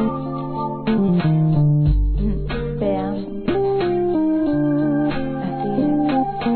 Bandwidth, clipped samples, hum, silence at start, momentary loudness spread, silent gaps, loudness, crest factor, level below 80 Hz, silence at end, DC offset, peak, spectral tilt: 4.5 kHz; under 0.1%; none; 0 s; 8 LU; none; -20 LUFS; 14 dB; -28 dBFS; 0 s; 0.4%; -6 dBFS; -12.5 dB/octave